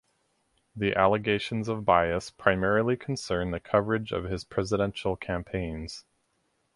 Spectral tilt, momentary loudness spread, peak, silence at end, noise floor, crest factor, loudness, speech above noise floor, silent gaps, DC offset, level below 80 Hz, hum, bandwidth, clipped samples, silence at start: -6 dB/octave; 9 LU; -6 dBFS; 0.75 s; -74 dBFS; 24 dB; -28 LUFS; 46 dB; none; under 0.1%; -48 dBFS; none; 11.5 kHz; under 0.1%; 0.75 s